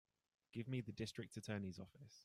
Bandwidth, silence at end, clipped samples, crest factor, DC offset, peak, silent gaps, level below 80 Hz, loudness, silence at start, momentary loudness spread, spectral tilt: 15 kHz; 0 s; under 0.1%; 16 dB; under 0.1%; -34 dBFS; none; -78 dBFS; -49 LUFS; 0.55 s; 9 LU; -6 dB/octave